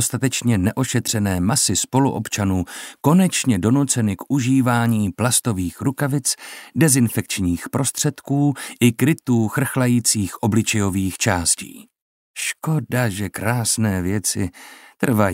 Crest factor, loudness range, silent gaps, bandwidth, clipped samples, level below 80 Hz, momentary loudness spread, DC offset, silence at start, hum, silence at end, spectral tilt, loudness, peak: 18 dB; 3 LU; 12.02-12.34 s; 16.5 kHz; under 0.1%; -50 dBFS; 7 LU; under 0.1%; 0 s; none; 0 s; -4.5 dB/octave; -19 LUFS; -2 dBFS